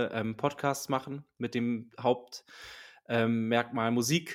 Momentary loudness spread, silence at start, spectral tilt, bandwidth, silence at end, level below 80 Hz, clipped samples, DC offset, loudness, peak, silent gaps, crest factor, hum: 18 LU; 0 s; -5 dB/octave; 16.5 kHz; 0 s; -72 dBFS; under 0.1%; under 0.1%; -31 LUFS; -10 dBFS; none; 20 dB; none